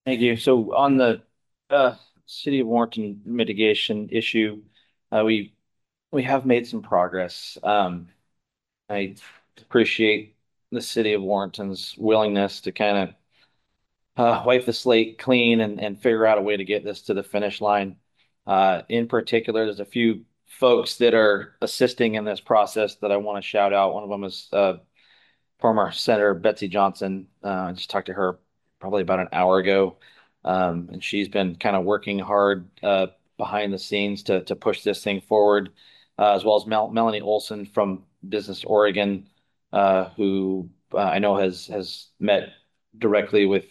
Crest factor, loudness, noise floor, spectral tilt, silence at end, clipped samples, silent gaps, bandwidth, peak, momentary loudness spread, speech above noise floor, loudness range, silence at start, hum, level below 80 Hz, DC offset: 18 dB; -22 LUFS; -83 dBFS; -5.5 dB/octave; 0.1 s; under 0.1%; none; 12.5 kHz; -4 dBFS; 11 LU; 61 dB; 3 LU; 0.05 s; none; -68 dBFS; under 0.1%